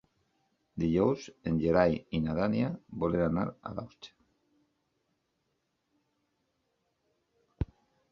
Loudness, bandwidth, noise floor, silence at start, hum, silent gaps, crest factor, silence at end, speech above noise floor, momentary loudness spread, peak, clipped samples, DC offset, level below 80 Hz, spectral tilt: -31 LUFS; 7.2 kHz; -80 dBFS; 0.75 s; none; none; 24 dB; 0.45 s; 50 dB; 15 LU; -10 dBFS; under 0.1%; under 0.1%; -52 dBFS; -8 dB/octave